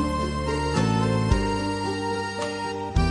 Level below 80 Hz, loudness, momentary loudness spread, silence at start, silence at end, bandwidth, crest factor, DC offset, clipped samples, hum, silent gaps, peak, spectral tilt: -32 dBFS; -25 LUFS; 6 LU; 0 s; 0 s; 11.5 kHz; 18 dB; under 0.1%; under 0.1%; none; none; -6 dBFS; -6 dB/octave